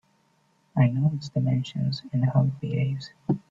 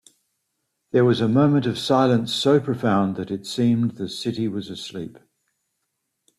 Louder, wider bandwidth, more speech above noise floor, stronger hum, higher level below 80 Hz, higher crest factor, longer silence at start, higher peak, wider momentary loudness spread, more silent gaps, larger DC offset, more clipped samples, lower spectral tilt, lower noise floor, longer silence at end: second, -26 LUFS vs -21 LUFS; second, 7.4 kHz vs 14 kHz; second, 41 dB vs 56 dB; neither; about the same, -60 dBFS vs -62 dBFS; about the same, 16 dB vs 18 dB; second, 0.75 s vs 0.95 s; second, -10 dBFS vs -4 dBFS; second, 8 LU vs 13 LU; neither; neither; neither; first, -8.5 dB/octave vs -6.5 dB/octave; second, -66 dBFS vs -77 dBFS; second, 0.1 s vs 1.25 s